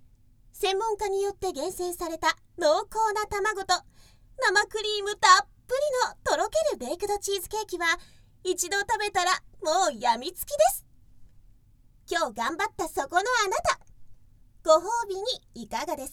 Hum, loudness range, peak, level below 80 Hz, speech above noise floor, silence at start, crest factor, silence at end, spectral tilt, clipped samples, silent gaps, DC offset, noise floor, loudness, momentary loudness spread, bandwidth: none; 5 LU; -6 dBFS; -54 dBFS; 31 dB; 0.55 s; 22 dB; 0 s; -1.5 dB/octave; under 0.1%; none; under 0.1%; -57 dBFS; -27 LUFS; 9 LU; 19 kHz